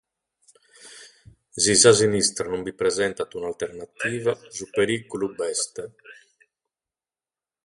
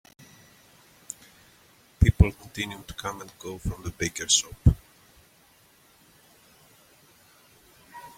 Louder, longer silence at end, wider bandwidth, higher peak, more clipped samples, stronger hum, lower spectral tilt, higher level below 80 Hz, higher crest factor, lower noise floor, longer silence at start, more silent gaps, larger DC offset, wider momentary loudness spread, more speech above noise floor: first, -22 LUFS vs -26 LUFS; first, 1.55 s vs 0.1 s; second, 11.5 kHz vs 16.5 kHz; about the same, -2 dBFS vs -4 dBFS; neither; neither; second, -2.5 dB/octave vs -4 dB/octave; second, -58 dBFS vs -36 dBFS; about the same, 24 dB vs 26 dB; first, under -90 dBFS vs -59 dBFS; second, 0.85 s vs 2 s; neither; neither; about the same, 19 LU vs 21 LU; first, over 67 dB vs 34 dB